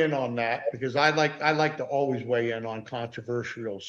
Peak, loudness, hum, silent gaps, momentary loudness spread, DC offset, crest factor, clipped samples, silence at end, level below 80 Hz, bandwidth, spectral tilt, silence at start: -8 dBFS; -27 LUFS; none; none; 11 LU; under 0.1%; 20 dB; under 0.1%; 0 s; -70 dBFS; 8 kHz; -5.5 dB/octave; 0 s